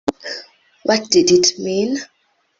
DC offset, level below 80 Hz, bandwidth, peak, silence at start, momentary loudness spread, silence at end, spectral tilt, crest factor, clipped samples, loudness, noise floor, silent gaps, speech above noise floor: under 0.1%; -56 dBFS; 8 kHz; 0 dBFS; 0.05 s; 17 LU; 0.55 s; -3 dB/octave; 18 dB; under 0.1%; -16 LUFS; -40 dBFS; none; 24 dB